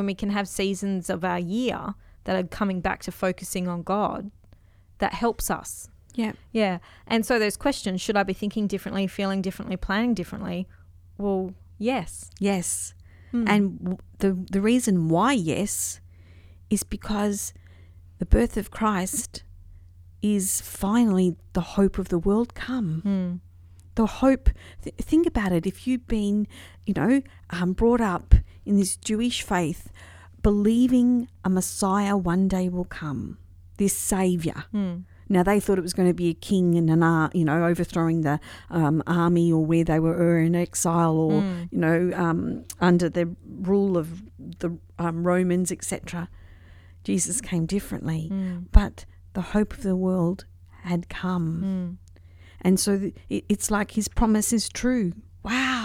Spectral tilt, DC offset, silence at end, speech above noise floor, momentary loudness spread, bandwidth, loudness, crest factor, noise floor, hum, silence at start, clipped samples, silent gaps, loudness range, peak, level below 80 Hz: -5.5 dB/octave; under 0.1%; 0 s; 30 dB; 11 LU; 16.5 kHz; -25 LUFS; 24 dB; -53 dBFS; none; 0 s; under 0.1%; none; 6 LU; 0 dBFS; -34 dBFS